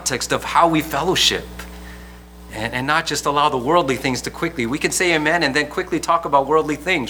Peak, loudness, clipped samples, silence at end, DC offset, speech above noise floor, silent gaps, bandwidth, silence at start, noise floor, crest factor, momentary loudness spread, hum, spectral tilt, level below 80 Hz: -2 dBFS; -18 LUFS; under 0.1%; 0 s; under 0.1%; 20 dB; none; over 20 kHz; 0 s; -39 dBFS; 18 dB; 16 LU; none; -3 dB/octave; -42 dBFS